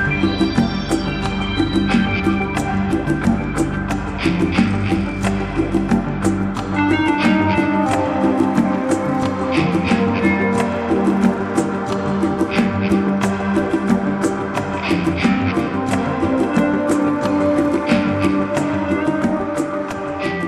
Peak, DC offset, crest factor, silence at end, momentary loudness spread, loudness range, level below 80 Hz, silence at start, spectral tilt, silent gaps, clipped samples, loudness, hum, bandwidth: -2 dBFS; under 0.1%; 14 dB; 0 s; 4 LU; 2 LU; -36 dBFS; 0 s; -6.5 dB/octave; none; under 0.1%; -18 LUFS; none; 13 kHz